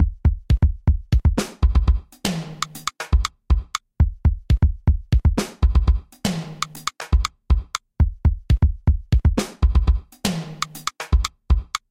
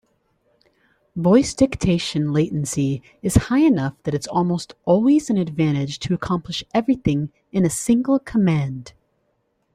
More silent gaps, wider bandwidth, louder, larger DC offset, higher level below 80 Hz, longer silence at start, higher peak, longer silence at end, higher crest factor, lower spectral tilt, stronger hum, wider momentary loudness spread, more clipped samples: neither; about the same, 15.5 kHz vs 15 kHz; about the same, -22 LUFS vs -20 LUFS; neither; first, -22 dBFS vs -42 dBFS; second, 0 s vs 1.15 s; second, -6 dBFS vs -2 dBFS; second, 0.15 s vs 0.85 s; about the same, 14 dB vs 18 dB; about the same, -5.5 dB/octave vs -6 dB/octave; neither; about the same, 8 LU vs 8 LU; neither